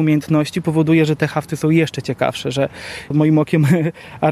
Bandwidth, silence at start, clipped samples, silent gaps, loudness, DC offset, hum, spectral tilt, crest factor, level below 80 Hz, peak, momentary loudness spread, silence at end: 14 kHz; 0 s; under 0.1%; none; -17 LUFS; under 0.1%; none; -7 dB/octave; 16 dB; -52 dBFS; -2 dBFS; 7 LU; 0 s